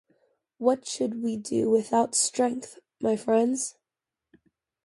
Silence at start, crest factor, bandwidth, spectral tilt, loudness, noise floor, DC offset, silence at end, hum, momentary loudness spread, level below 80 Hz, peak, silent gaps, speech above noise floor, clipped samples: 0.6 s; 20 dB; 11.5 kHz; -3.5 dB/octave; -26 LUFS; -89 dBFS; under 0.1%; 1.15 s; none; 8 LU; -72 dBFS; -8 dBFS; none; 63 dB; under 0.1%